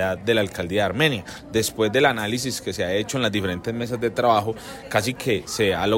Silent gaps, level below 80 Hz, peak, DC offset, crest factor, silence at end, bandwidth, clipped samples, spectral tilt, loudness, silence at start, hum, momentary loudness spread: none; -52 dBFS; -4 dBFS; under 0.1%; 18 dB; 0 s; 16.5 kHz; under 0.1%; -4.5 dB/octave; -23 LUFS; 0 s; none; 7 LU